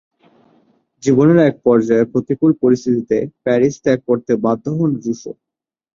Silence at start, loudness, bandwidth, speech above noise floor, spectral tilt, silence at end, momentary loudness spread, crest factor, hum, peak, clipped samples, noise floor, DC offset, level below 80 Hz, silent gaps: 1.05 s; -16 LUFS; 7.4 kHz; 42 dB; -7.5 dB/octave; 0.65 s; 9 LU; 14 dB; none; -2 dBFS; under 0.1%; -57 dBFS; under 0.1%; -56 dBFS; none